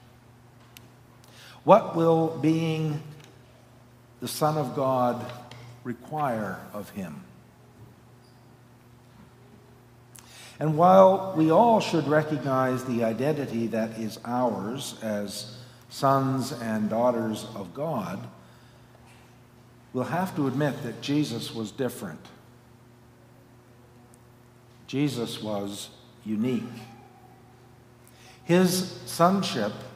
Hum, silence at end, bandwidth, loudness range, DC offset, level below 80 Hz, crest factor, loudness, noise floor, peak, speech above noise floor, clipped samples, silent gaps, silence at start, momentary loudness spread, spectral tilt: none; 0 s; 16 kHz; 14 LU; under 0.1%; -68 dBFS; 26 dB; -26 LUFS; -54 dBFS; -2 dBFS; 29 dB; under 0.1%; none; 0.75 s; 20 LU; -6 dB/octave